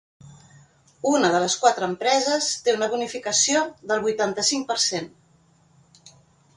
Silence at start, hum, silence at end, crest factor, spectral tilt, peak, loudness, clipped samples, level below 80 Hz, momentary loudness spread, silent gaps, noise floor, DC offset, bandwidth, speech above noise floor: 0.25 s; none; 0.5 s; 20 dB; -2 dB/octave; -4 dBFS; -22 LUFS; under 0.1%; -68 dBFS; 6 LU; none; -59 dBFS; under 0.1%; 11.5 kHz; 37 dB